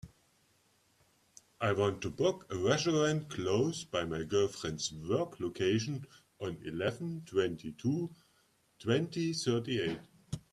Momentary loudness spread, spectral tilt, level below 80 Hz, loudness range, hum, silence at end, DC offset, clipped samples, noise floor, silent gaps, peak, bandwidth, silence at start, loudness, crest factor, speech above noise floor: 11 LU; -5 dB/octave; -66 dBFS; 4 LU; none; 0.15 s; under 0.1%; under 0.1%; -71 dBFS; none; -16 dBFS; 13 kHz; 0.05 s; -34 LUFS; 20 dB; 38 dB